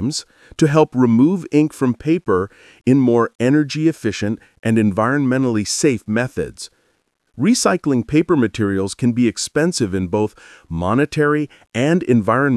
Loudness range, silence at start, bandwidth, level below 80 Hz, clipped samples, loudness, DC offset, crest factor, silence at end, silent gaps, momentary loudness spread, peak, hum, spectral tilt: 3 LU; 0 s; 12 kHz; -52 dBFS; under 0.1%; -17 LUFS; under 0.1%; 16 dB; 0 s; 3.35-3.39 s, 4.59-4.63 s; 10 LU; -2 dBFS; none; -5.5 dB/octave